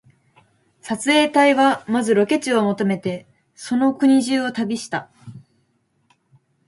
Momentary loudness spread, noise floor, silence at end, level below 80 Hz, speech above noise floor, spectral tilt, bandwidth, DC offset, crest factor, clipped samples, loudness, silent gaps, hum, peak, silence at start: 14 LU; -66 dBFS; 1.3 s; -66 dBFS; 48 dB; -4.5 dB/octave; 11.5 kHz; under 0.1%; 18 dB; under 0.1%; -19 LUFS; none; none; -4 dBFS; 0.85 s